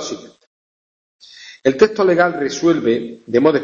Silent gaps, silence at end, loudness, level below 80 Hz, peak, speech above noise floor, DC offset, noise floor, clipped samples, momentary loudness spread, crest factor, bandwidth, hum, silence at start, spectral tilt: 0.47-1.19 s; 0 s; -16 LUFS; -56 dBFS; 0 dBFS; over 75 dB; under 0.1%; under -90 dBFS; under 0.1%; 13 LU; 18 dB; 7.4 kHz; none; 0 s; -5 dB/octave